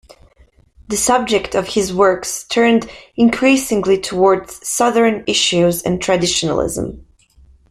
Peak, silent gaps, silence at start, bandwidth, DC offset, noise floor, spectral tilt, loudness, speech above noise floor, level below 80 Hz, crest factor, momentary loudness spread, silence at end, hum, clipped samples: -2 dBFS; none; 0.9 s; 15 kHz; under 0.1%; -51 dBFS; -3.5 dB/octave; -15 LUFS; 36 dB; -44 dBFS; 16 dB; 8 LU; 0.7 s; none; under 0.1%